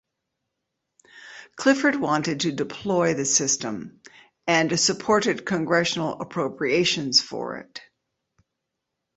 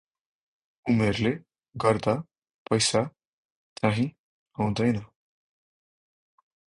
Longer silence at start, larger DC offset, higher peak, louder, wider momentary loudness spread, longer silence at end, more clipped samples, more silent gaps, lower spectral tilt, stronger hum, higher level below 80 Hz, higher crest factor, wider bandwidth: first, 1.15 s vs 0.85 s; neither; about the same, -6 dBFS vs -8 dBFS; first, -23 LUFS vs -27 LUFS; first, 17 LU vs 12 LU; second, 1.35 s vs 1.7 s; neither; second, none vs 2.54-2.65 s, 3.27-3.76 s, 4.19-4.46 s; second, -3 dB/octave vs -5 dB/octave; neither; second, -64 dBFS vs -56 dBFS; about the same, 20 dB vs 20 dB; second, 8.4 kHz vs 11 kHz